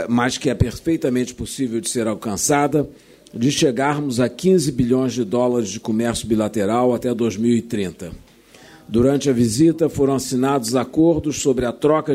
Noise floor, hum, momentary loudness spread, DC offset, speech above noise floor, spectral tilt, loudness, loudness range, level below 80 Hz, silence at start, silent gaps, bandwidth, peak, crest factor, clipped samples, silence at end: -46 dBFS; none; 6 LU; under 0.1%; 28 dB; -5.5 dB/octave; -19 LUFS; 3 LU; -44 dBFS; 0 s; none; 16 kHz; -4 dBFS; 14 dB; under 0.1%; 0 s